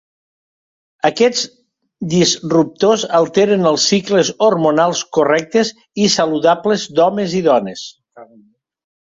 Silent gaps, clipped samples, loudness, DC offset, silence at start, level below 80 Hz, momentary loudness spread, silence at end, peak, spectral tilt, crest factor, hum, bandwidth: none; under 0.1%; -15 LUFS; under 0.1%; 1.05 s; -58 dBFS; 6 LU; 0.95 s; 0 dBFS; -4 dB/octave; 14 dB; none; 7.8 kHz